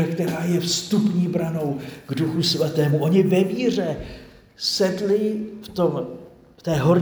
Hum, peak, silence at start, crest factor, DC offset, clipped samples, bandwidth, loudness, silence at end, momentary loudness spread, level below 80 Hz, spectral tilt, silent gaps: none; -4 dBFS; 0 s; 16 dB; under 0.1%; under 0.1%; over 20 kHz; -22 LUFS; 0 s; 13 LU; -52 dBFS; -5.5 dB/octave; none